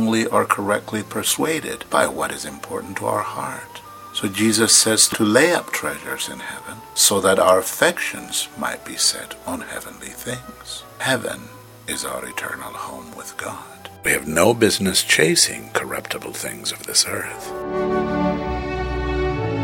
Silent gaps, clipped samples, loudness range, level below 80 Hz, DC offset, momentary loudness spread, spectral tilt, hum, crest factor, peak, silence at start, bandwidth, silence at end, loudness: none; under 0.1%; 10 LU; -40 dBFS; under 0.1%; 17 LU; -2.5 dB/octave; none; 22 dB; 0 dBFS; 0 s; 17.5 kHz; 0 s; -20 LUFS